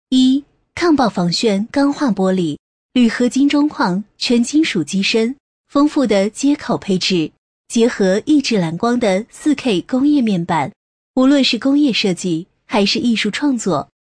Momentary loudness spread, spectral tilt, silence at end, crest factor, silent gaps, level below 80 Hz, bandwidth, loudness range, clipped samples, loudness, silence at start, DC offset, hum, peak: 7 LU; -5 dB/octave; 0.15 s; 12 dB; 2.59-2.89 s, 5.40-5.64 s, 7.38-7.64 s, 10.76-11.14 s; -52 dBFS; 10.5 kHz; 1 LU; under 0.1%; -16 LUFS; 0.1 s; under 0.1%; none; -4 dBFS